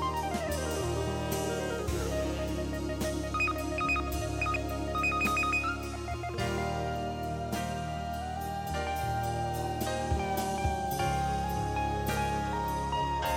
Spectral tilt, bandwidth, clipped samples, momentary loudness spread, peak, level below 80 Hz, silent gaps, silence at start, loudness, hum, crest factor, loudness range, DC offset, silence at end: -5 dB/octave; 16.5 kHz; under 0.1%; 6 LU; -18 dBFS; -42 dBFS; none; 0 s; -32 LUFS; none; 14 dB; 4 LU; under 0.1%; 0 s